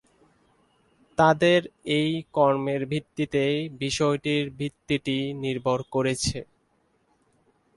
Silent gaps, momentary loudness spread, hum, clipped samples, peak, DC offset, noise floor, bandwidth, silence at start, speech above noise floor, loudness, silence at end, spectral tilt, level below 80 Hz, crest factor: none; 8 LU; none; under 0.1%; -6 dBFS; under 0.1%; -68 dBFS; 11.5 kHz; 1.2 s; 43 dB; -25 LUFS; 1.35 s; -5 dB/octave; -54 dBFS; 20 dB